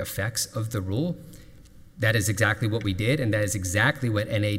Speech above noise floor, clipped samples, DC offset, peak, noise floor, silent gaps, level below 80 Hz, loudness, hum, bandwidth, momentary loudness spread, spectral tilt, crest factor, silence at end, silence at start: 23 dB; under 0.1%; under 0.1%; -8 dBFS; -48 dBFS; none; -50 dBFS; -25 LUFS; none; 16 kHz; 6 LU; -4.5 dB/octave; 18 dB; 0 s; 0 s